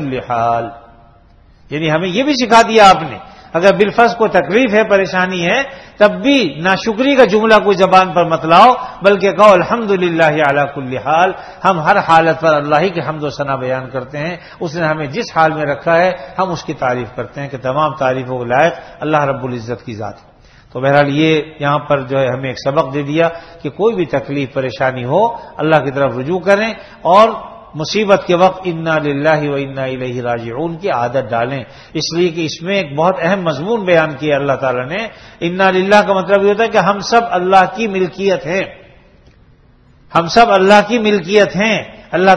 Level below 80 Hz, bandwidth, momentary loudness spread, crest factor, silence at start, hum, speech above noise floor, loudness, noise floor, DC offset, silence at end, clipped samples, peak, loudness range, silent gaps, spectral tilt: -46 dBFS; 12 kHz; 12 LU; 14 dB; 0 s; none; 34 dB; -13 LUFS; -47 dBFS; under 0.1%; 0 s; 0.3%; 0 dBFS; 6 LU; none; -5.5 dB/octave